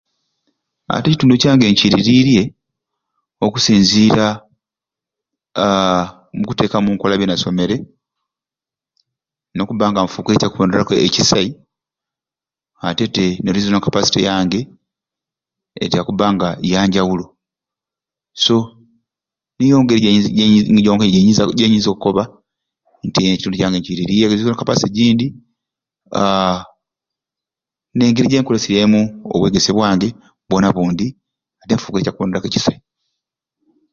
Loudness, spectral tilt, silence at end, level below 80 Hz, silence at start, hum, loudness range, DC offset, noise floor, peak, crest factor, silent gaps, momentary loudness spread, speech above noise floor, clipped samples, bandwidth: -15 LUFS; -5 dB/octave; 1.2 s; -46 dBFS; 0.9 s; none; 6 LU; under 0.1%; -90 dBFS; 0 dBFS; 16 dB; none; 11 LU; 76 dB; under 0.1%; 7.6 kHz